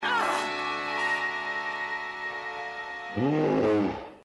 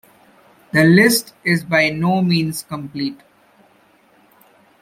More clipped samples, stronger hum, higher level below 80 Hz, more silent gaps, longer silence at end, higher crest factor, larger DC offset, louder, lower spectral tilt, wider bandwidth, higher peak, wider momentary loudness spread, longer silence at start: neither; neither; about the same, -62 dBFS vs -58 dBFS; neither; second, 0.05 s vs 1.65 s; about the same, 14 dB vs 18 dB; neither; second, -28 LUFS vs -16 LUFS; about the same, -5 dB/octave vs -5 dB/octave; second, 11.5 kHz vs 16 kHz; second, -16 dBFS vs 0 dBFS; second, 10 LU vs 15 LU; second, 0 s vs 0.75 s